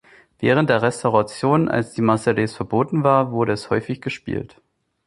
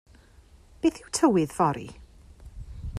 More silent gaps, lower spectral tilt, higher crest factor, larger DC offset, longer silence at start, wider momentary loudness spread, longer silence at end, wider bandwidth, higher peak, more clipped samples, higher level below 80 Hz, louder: neither; about the same, -6.5 dB/octave vs -5.5 dB/octave; about the same, 18 dB vs 20 dB; neither; second, 0.4 s vs 0.85 s; second, 10 LU vs 22 LU; first, 0.6 s vs 0 s; second, 11.5 kHz vs 14.5 kHz; first, -2 dBFS vs -8 dBFS; neither; second, -52 dBFS vs -46 dBFS; first, -20 LUFS vs -25 LUFS